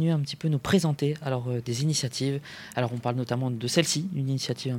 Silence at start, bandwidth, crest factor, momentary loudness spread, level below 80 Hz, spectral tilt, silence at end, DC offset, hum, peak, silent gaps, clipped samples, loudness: 0 s; 16.5 kHz; 18 dB; 6 LU; -62 dBFS; -5 dB/octave; 0 s; under 0.1%; none; -8 dBFS; none; under 0.1%; -28 LUFS